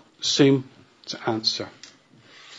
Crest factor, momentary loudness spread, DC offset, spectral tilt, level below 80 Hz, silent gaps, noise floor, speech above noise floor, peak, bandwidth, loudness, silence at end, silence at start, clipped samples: 20 dB; 18 LU; under 0.1%; -4.5 dB/octave; -72 dBFS; none; -52 dBFS; 30 dB; -6 dBFS; 8 kHz; -22 LUFS; 0 s; 0.2 s; under 0.1%